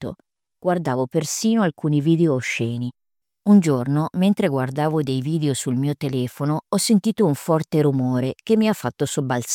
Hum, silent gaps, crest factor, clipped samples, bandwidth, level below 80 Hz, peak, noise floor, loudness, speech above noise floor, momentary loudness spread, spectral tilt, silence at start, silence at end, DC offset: none; none; 16 dB; under 0.1%; 17 kHz; -62 dBFS; -4 dBFS; -58 dBFS; -21 LUFS; 38 dB; 6 LU; -6 dB/octave; 0 s; 0 s; under 0.1%